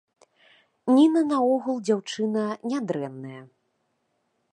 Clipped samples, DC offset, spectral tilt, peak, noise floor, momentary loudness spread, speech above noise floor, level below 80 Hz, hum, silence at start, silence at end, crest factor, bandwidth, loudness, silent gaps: under 0.1%; under 0.1%; -6 dB/octave; -8 dBFS; -74 dBFS; 16 LU; 50 dB; -80 dBFS; none; 0.85 s; 1.1 s; 18 dB; 10.5 kHz; -24 LUFS; none